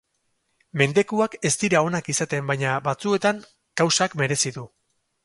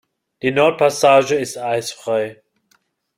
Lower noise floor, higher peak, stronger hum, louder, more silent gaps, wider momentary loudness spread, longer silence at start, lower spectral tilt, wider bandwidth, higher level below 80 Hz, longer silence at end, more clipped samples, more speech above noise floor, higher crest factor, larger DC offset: first, -72 dBFS vs -63 dBFS; about the same, -2 dBFS vs -2 dBFS; neither; second, -22 LUFS vs -17 LUFS; neither; second, 6 LU vs 10 LU; first, 0.75 s vs 0.45 s; about the same, -4 dB/octave vs -4 dB/octave; second, 11.5 kHz vs 16 kHz; about the same, -62 dBFS vs -62 dBFS; second, 0.6 s vs 0.85 s; neither; about the same, 49 dB vs 46 dB; about the same, 20 dB vs 18 dB; neither